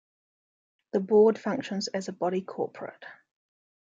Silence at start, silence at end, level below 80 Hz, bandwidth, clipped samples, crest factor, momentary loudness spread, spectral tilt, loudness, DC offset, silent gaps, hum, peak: 0.95 s; 0.85 s; -76 dBFS; 7.8 kHz; under 0.1%; 18 dB; 20 LU; -5.5 dB/octave; -27 LUFS; under 0.1%; none; none; -12 dBFS